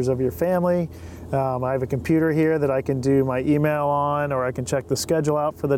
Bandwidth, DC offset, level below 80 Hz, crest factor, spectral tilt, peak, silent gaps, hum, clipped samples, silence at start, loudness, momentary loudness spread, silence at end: 17.5 kHz; under 0.1%; -50 dBFS; 12 dB; -6.5 dB/octave; -10 dBFS; none; none; under 0.1%; 0 s; -22 LUFS; 5 LU; 0 s